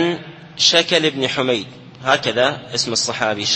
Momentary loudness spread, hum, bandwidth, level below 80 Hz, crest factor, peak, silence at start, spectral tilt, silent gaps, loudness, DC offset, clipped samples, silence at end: 12 LU; none; 11 kHz; -58 dBFS; 18 dB; 0 dBFS; 0 s; -2.5 dB/octave; none; -17 LUFS; under 0.1%; under 0.1%; 0 s